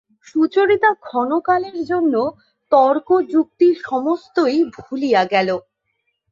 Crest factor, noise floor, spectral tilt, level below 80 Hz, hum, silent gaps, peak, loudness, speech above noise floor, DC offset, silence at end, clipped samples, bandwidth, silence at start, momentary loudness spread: 16 dB; -71 dBFS; -6 dB/octave; -62 dBFS; none; none; -2 dBFS; -18 LUFS; 54 dB; under 0.1%; 0.7 s; under 0.1%; 7.4 kHz; 0.35 s; 8 LU